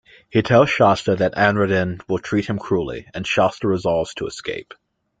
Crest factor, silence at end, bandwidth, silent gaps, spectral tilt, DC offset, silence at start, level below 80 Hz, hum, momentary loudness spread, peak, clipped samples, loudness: 18 dB; 0.6 s; 9.2 kHz; none; -6 dB/octave; under 0.1%; 0.35 s; -50 dBFS; none; 13 LU; -2 dBFS; under 0.1%; -19 LUFS